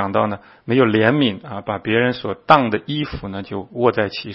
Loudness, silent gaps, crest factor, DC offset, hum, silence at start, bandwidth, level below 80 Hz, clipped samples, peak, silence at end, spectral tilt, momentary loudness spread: -19 LUFS; none; 18 dB; under 0.1%; none; 0 s; 6.4 kHz; -48 dBFS; under 0.1%; 0 dBFS; 0 s; -8.5 dB/octave; 14 LU